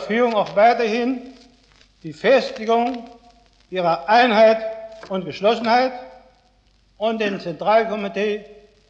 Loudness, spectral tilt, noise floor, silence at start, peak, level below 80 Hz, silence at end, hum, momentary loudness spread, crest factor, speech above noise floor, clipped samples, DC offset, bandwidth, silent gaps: -19 LUFS; -5.5 dB/octave; -58 dBFS; 0 s; -4 dBFS; -60 dBFS; 0.35 s; none; 15 LU; 16 dB; 39 dB; under 0.1%; under 0.1%; 7.8 kHz; none